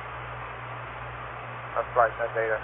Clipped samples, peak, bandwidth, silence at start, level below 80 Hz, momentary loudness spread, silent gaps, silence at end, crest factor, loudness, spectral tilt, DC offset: under 0.1%; -8 dBFS; 3.9 kHz; 0 s; -50 dBFS; 13 LU; none; 0 s; 22 dB; -30 LUFS; -9 dB/octave; under 0.1%